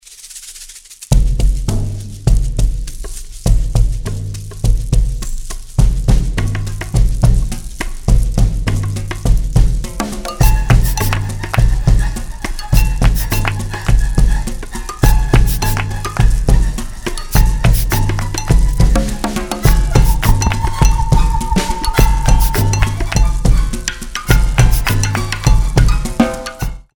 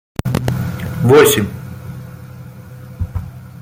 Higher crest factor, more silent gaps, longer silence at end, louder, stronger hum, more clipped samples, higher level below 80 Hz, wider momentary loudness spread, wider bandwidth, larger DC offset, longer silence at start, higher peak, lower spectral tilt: about the same, 12 dB vs 16 dB; neither; first, 0.15 s vs 0 s; about the same, -16 LUFS vs -15 LUFS; neither; neither; first, -14 dBFS vs -38 dBFS; second, 11 LU vs 26 LU; first, over 20 kHz vs 16.5 kHz; first, 0.3% vs under 0.1%; second, 0.1 s vs 0.25 s; about the same, 0 dBFS vs 0 dBFS; about the same, -5 dB/octave vs -5 dB/octave